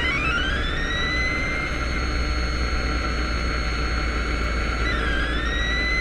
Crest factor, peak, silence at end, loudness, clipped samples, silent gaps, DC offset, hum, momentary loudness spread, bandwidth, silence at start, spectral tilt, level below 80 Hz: 12 dB; -10 dBFS; 0 s; -24 LUFS; under 0.1%; none; under 0.1%; none; 3 LU; 10.5 kHz; 0 s; -4.5 dB/octave; -26 dBFS